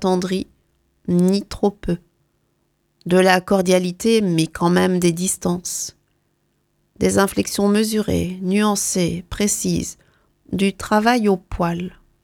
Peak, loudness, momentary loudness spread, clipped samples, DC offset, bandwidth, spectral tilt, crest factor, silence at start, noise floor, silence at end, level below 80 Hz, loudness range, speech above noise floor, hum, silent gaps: 0 dBFS; -19 LUFS; 10 LU; under 0.1%; under 0.1%; 17.5 kHz; -5 dB/octave; 20 dB; 0 s; -67 dBFS; 0.35 s; -44 dBFS; 3 LU; 48 dB; none; none